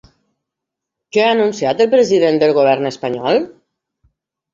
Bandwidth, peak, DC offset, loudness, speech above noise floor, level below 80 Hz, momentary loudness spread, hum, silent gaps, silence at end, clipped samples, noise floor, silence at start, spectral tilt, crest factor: 7.6 kHz; -2 dBFS; under 0.1%; -14 LUFS; 68 dB; -60 dBFS; 8 LU; none; none; 1.05 s; under 0.1%; -81 dBFS; 1.15 s; -5 dB/octave; 14 dB